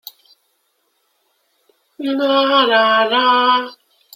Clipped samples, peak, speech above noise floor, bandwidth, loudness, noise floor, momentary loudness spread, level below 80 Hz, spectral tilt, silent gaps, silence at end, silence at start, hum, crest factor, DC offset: under 0.1%; -2 dBFS; 51 dB; 16.5 kHz; -14 LUFS; -66 dBFS; 11 LU; -74 dBFS; -3.5 dB/octave; none; 0.45 s; 2 s; none; 16 dB; under 0.1%